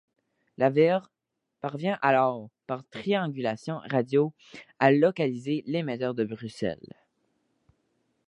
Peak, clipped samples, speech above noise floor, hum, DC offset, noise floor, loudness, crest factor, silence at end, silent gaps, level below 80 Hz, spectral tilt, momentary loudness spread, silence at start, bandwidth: -4 dBFS; under 0.1%; 57 dB; none; under 0.1%; -83 dBFS; -27 LUFS; 24 dB; 1.55 s; none; -70 dBFS; -7.5 dB/octave; 14 LU; 0.6 s; 10.5 kHz